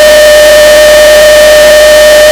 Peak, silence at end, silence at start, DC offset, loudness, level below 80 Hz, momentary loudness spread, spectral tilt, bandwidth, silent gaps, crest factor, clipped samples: 0 dBFS; 0 s; 0 s; 0.2%; -1 LUFS; -24 dBFS; 0 LU; -1 dB/octave; over 20 kHz; none; 0 dB; 40%